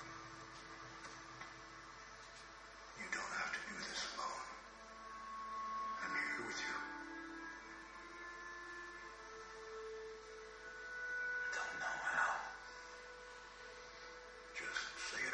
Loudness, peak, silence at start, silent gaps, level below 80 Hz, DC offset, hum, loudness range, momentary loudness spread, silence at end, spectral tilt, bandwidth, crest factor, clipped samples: -46 LUFS; -26 dBFS; 0 s; none; -70 dBFS; under 0.1%; none; 8 LU; 14 LU; 0 s; -1.5 dB/octave; 9.4 kHz; 22 dB; under 0.1%